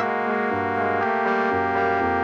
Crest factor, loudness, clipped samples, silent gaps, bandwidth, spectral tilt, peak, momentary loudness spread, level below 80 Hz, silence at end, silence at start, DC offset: 14 dB; -22 LUFS; under 0.1%; none; 7.4 kHz; -7 dB/octave; -8 dBFS; 2 LU; -54 dBFS; 0 s; 0 s; under 0.1%